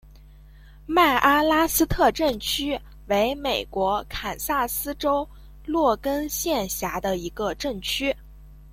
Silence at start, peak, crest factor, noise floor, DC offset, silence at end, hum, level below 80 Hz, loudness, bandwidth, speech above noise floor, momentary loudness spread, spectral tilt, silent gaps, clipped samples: 0.05 s; -6 dBFS; 20 dB; -47 dBFS; under 0.1%; 0 s; none; -42 dBFS; -23 LUFS; 16.5 kHz; 24 dB; 10 LU; -3 dB/octave; none; under 0.1%